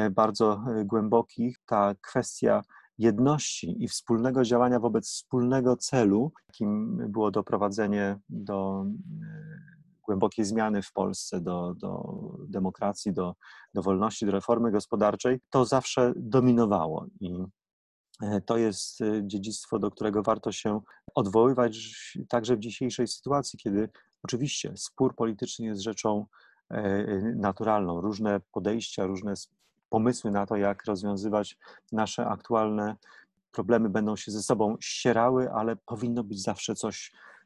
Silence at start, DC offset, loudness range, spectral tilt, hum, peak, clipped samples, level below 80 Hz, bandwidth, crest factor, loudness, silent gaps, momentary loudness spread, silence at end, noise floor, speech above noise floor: 0 s; under 0.1%; 5 LU; -5.5 dB/octave; none; -8 dBFS; under 0.1%; -60 dBFS; 12 kHz; 20 dB; -28 LUFS; 17.73-18.04 s, 29.85-29.89 s; 12 LU; 0.15 s; -54 dBFS; 26 dB